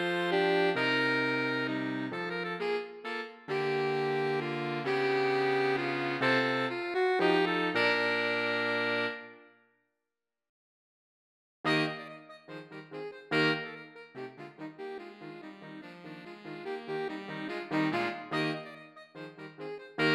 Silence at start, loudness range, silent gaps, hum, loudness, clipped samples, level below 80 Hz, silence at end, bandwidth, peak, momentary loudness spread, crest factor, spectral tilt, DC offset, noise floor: 0 s; 10 LU; 10.49-11.64 s; none; -30 LUFS; under 0.1%; -82 dBFS; 0 s; 12.5 kHz; -14 dBFS; 19 LU; 18 dB; -5.5 dB/octave; under 0.1%; -90 dBFS